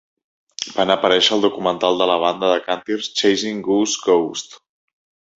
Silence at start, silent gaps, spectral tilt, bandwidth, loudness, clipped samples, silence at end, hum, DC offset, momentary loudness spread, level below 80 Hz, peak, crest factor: 0.6 s; none; -3 dB/octave; 8 kHz; -18 LUFS; under 0.1%; 0.85 s; none; under 0.1%; 11 LU; -62 dBFS; -2 dBFS; 18 dB